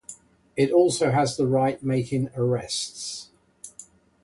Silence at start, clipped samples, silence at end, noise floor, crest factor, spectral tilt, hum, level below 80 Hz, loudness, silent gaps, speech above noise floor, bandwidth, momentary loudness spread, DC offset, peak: 0.1 s; under 0.1%; 0.4 s; -50 dBFS; 18 dB; -5.5 dB/octave; none; -60 dBFS; -24 LUFS; none; 27 dB; 11.5 kHz; 22 LU; under 0.1%; -8 dBFS